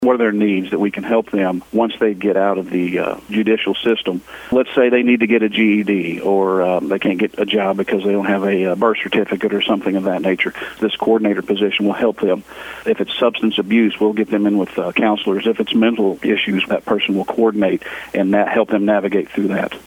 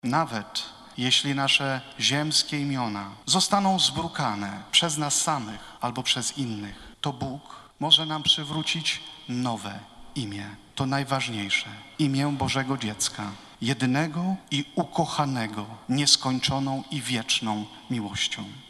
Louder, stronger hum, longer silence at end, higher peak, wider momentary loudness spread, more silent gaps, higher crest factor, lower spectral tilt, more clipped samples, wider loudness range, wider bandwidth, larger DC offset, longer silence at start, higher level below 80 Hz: first, -17 LUFS vs -25 LUFS; neither; about the same, 0.05 s vs 0 s; first, 0 dBFS vs -4 dBFS; second, 5 LU vs 13 LU; neither; second, 16 dB vs 22 dB; first, -6.5 dB/octave vs -3 dB/octave; neither; about the same, 2 LU vs 4 LU; first, 16 kHz vs 13 kHz; neither; about the same, 0 s vs 0.05 s; about the same, -56 dBFS vs -58 dBFS